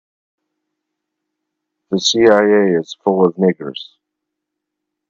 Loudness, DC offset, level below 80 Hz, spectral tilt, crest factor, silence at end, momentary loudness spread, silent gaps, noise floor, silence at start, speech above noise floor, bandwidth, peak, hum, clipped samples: -14 LUFS; under 0.1%; -62 dBFS; -4.5 dB/octave; 18 dB; 1.25 s; 15 LU; none; -79 dBFS; 1.9 s; 65 dB; 7.6 kHz; 0 dBFS; none; under 0.1%